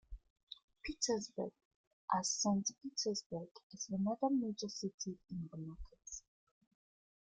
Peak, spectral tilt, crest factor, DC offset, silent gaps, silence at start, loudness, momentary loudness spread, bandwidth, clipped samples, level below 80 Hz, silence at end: -20 dBFS; -4 dB/octave; 22 dB; under 0.1%; 0.30-0.36 s, 0.43-0.47 s, 0.63-0.68 s, 1.65-2.08 s, 3.26-3.30 s, 3.51-3.55 s, 3.63-3.70 s, 4.94-4.98 s; 0.1 s; -40 LUFS; 19 LU; 9.6 kHz; under 0.1%; -62 dBFS; 1.15 s